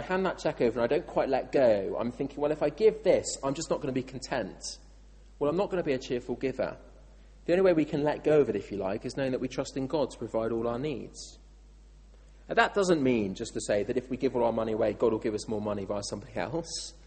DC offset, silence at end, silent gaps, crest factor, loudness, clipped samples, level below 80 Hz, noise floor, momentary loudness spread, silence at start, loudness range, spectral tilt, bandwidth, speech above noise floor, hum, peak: under 0.1%; 0 s; none; 20 dB; -29 LUFS; under 0.1%; -52 dBFS; -53 dBFS; 10 LU; 0 s; 5 LU; -5 dB/octave; 8.8 kHz; 24 dB; none; -8 dBFS